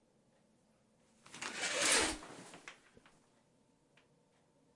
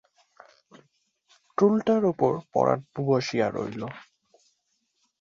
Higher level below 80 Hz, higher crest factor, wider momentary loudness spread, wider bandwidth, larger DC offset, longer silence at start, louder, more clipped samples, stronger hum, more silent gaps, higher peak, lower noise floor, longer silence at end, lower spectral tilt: about the same, -66 dBFS vs -66 dBFS; first, 26 dB vs 20 dB; first, 25 LU vs 14 LU; first, 11.5 kHz vs 7.6 kHz; neither; second, 1.3 s vs 1.6 s; second, -34 LUFS vs -25 LUFS; neither; neither; neither; second, -18 dBFS vs -8 dBFS; about the same, -73 dBFS vs -74 dBFS; first, 2 s vs 1.25 s; second, 0 dB/octave vs -7 dB/octave